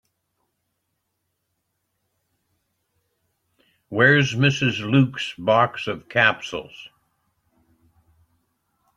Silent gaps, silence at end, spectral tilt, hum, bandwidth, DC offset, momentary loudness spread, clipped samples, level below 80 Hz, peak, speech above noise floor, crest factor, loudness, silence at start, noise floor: none; 2.1 s; -5.5 dB/octave; none; 8.2 kHz; under 0.1%; 15 LU; under 0.1%; -62 dBFS; -2 dBFS; 56 dB; 22 dB; -20 LUFS; 3.9 s; -76 dBFS